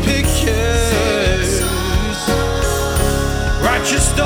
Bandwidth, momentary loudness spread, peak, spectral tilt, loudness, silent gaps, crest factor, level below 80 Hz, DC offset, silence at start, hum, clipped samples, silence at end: 20 kHz; 3 LU; -2 dBFS; -4 dB/octave; -16 LUFS; none; 12 dB; -20 dBFS; under 0.1%; 0 s; none; under 0.1%; 0 s